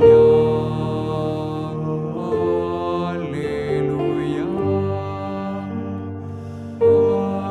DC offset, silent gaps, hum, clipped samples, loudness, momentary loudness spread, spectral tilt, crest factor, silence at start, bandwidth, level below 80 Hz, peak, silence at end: under 0.1%; none; none; under 0.1%; -21 LUFS; 12 LU; -9 dB/octave; 18 dB; 0 s; 8.8 kHz; -46 dBFS; -2 dBFS; 0 s